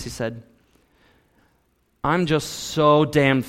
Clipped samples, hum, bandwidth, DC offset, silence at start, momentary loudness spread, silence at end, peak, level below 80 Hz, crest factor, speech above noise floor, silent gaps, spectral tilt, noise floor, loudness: under 0.1%; none; 16.5 kHz; under 0.1%; 0 s; 13 LU; 0 s; -4 dBFS; -50 dBFS; 18 dB; 45 dB; none; -5.5 dB/octave; -65 dBFS; -21 LUFS